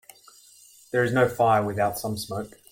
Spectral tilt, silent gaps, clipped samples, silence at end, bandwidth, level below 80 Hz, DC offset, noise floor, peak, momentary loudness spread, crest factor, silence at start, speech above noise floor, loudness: -5.5 dB/octave; none; under 0.1%; 0.25 s; 17 kHz; -60 dBFS; under 0.1%; -53 dBFS; -8 dBFS; 11 LU; 18 dB; 0.95 s; 29 dB; -24 LUFS